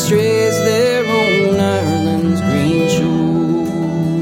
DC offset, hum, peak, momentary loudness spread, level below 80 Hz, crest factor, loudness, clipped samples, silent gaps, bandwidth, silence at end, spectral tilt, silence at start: under 0.1%; none; -2 dBFS; 4 LU; -46 dBFS; 12 dB; -15 LUFS; under 0.1%; none; 16.5 kHz; 0 s; -5.5 dB/octave; 0 s